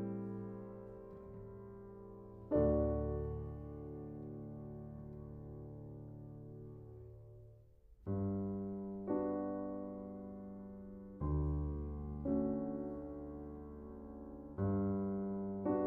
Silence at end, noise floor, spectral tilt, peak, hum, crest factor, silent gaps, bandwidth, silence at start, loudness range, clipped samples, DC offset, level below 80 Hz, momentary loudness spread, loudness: 0 s; -62 dBFS; -12.5 dB/octave; -22 dBFS; none; 20 dB; none; 2.8 kHz; 0 s; 10 LU; under 0.1%; under 0.1%; -52 dBFS; 16 LU; -42 LUFS